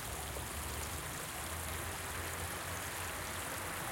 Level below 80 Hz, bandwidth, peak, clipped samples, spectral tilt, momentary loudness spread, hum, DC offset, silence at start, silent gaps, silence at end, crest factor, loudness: -52 dBFS; 17 kHz; -26 dBFS; under 0.1%; -2.5 dB/octave; 1 LU; none; under 0.1%; 0 s; none; 0 s; 14 dB; -40 LUFS